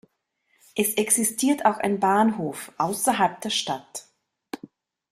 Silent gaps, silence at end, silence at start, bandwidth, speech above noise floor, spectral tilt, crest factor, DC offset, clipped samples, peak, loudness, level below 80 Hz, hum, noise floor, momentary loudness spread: none; 0.55 s; 0.75 s; 16 kHz; 48 dB; -3 dB/octave; 20 dB; under 0.1%; under 0.1%; -6 dBFS; -23 LUFS; -68 dBFS; none; -71 dBFS; 19 LU